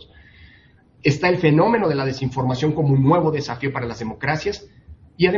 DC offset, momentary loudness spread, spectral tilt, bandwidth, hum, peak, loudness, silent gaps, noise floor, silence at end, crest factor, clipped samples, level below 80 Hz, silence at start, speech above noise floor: under 0.1%; 10 LU; -7 dB/octave; 7.4 kHz; none; -2 dBFS; -20 LUFS; none; -52 dBFS; 0 s; 18 dB; under 0.1%; -50 dBFS; 1.05 s; 33 dB